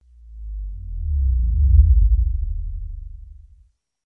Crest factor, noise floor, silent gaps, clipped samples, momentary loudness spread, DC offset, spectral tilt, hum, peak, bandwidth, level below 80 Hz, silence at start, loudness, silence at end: 18 dB; -56 dBFS; none; under 0.1%; 21 LU; under 0.1%; -13 dB/octave; none; -2 dBFS; 0.4 kHz; -20 dBFS; 0.25 s; -20 LUFS; 0.75 s